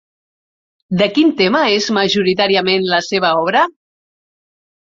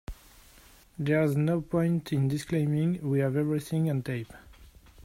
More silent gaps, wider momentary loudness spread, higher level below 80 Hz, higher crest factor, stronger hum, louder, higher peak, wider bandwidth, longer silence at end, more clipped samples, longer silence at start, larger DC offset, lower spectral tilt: neither; second, 3 LU vs 10 LU; about the same, -58 dBFS vs -54 dBFS; about the same, 16 dB vs 16 dB; neither; first, -14 LUFS vs -28 LUFS; first, 0 dBFS vs -14 dBFS; second, 7.6 kHz vs 16 kHz; first, 1.2 s vs 0 s; neither; first, 0.9 s vs 0.1 s; neither; second, -4.5 dB/octave vs -8 dB/octave